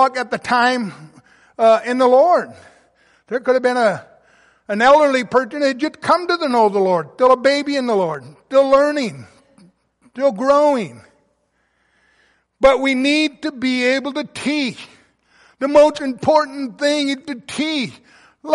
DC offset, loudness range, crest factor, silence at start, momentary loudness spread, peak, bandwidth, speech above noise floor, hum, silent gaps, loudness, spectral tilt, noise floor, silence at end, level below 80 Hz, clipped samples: under 0.1%; 3 LU; 16 dB; 0 s; 12 LU; -2 dBFS; 11.5 kHz; 49 dB; none; none; -17 LUFS; -4.5 dB/octave; -65 dBFS; 0 s; -56 dBFS; under 0.1%